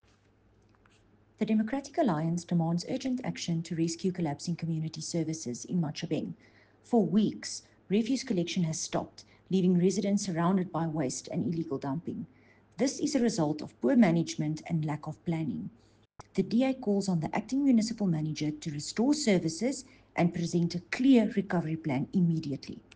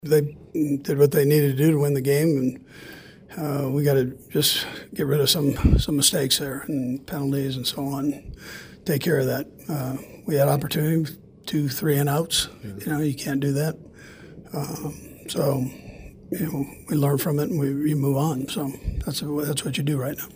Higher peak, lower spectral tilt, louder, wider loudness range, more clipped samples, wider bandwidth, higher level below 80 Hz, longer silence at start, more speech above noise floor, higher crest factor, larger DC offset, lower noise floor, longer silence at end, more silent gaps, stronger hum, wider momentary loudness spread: second, -12 dBFS vs -4 dBFS; about the same, -6 dB/octave vs -5 dB/octave; second, -30 LUFS vs -24 LUFS; about the same, 4 LU vs 6 LU; neither; second, 9.8 kHz vs 16 kHz; second, -66 dBFS vs -38 dBFS; first, 1.4 s vs 0.05 s; first, 35 dB vs 21 dB; about the same, 18 dB vs 18 dB; neither; first, -65 dBFS vs -45 dBFS; first, 0.15 s vs 0 s; neither; neither; second, 10 LU vs 14 LU